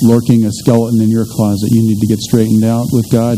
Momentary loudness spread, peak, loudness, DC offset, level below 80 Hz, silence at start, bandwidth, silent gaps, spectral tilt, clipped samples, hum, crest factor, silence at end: 3 LU; 0 dBFS; -12 LUFS; under 0.1%; -42 dBFS; 0 s; 16 kHz; none; -7.5 dB/octave; 0.3%; none; 10 dB; 0 s